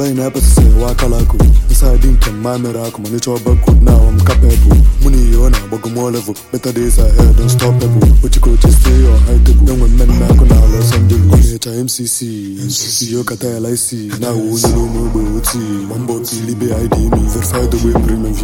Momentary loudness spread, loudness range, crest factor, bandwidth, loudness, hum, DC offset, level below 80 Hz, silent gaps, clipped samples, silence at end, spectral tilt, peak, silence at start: 10 LU; 6 LU; 8 dB; 17 kHz; -12 LUFS; none; under 0.1%; -10 dBFS; none; under 0.1%; 0 s; -6 dB/octave; 0 dBFS; 0 s